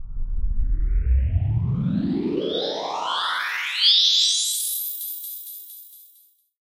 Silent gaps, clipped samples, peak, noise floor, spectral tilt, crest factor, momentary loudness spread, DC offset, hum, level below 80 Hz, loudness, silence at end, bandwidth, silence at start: none; under 0.1%; -4 dBFS; -57 dBFS; -3 dB/octave; 18 dB; 17 LU; under 0.1%; none; -28 dBFS; -21 LUFS; 0.6 s; 16 kHz; 0 s